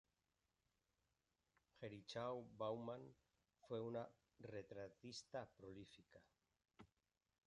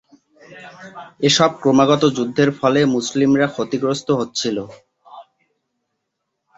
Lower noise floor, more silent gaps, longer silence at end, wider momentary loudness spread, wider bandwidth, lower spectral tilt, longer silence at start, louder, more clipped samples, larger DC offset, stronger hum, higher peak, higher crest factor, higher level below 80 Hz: first, under -90 dBFS vs -76 dBFS; neither; second, 0.6 s vs 1.35 s; second, 13 LU vs 21 LU; first, 10 kHz vs 8 kHz; about the same, -5.5 dB/octave vs -4.5 dB/octave; first, 1.75 s vs 0.5 s; second, -53 LUFS vs -17 LUFS; neither; neither; neither; second, -36 dBFS vs -2 dBFS; about the same, 20 dB vs 18 dB; second, -84 dBFS vs -58 dBFS